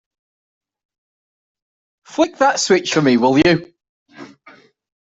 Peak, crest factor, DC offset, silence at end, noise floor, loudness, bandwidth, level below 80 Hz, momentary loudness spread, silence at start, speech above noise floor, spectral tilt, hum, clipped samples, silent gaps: -2 dBFS; 18 dB; under 0.1%; 0.9 s; -48 dBFS; -15 LUFS; 8.2 kHz; -54 dBFS; 7 LU; 2.15 s; 33 dB; -4.5 dB/octave; none; under 0.1%; 3.89-4.06 s